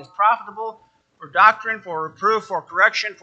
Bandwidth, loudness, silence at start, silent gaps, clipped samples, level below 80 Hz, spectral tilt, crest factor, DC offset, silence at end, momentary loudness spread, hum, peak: 8 kHz; -19 LUFS; 0 s; none; under 0.1%; -76 dBFS; -2.5 dB/octave; 20 dB; under 0.1%; 0.1 s; 15 LU; none; 0 dBFS